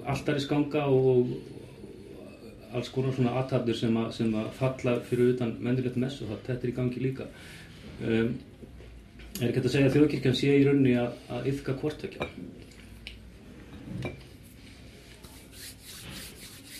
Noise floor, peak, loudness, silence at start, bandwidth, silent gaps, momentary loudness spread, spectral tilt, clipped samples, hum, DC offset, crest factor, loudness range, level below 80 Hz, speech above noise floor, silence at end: -49 dBFS; -10 dBFS; -28 LUFS; 0 s; 15 kHz; none; 24 LU; -7 dB/octave; under 0.1%; none; under 0.1%; 20 dB; 17 LU; -54 dBFS; 22 dB; 0 s